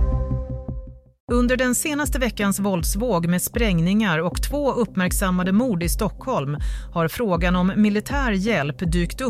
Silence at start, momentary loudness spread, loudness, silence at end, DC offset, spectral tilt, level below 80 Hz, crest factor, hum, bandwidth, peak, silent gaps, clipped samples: 0 s; 7 LU; -22 LUFS; 0 s; under 0.1%; -5.5 dB/octave; -30 dBFS; 14 dB; none; 16 kHz; -8 dBFS; 1.20-1.28 s; under 0.1%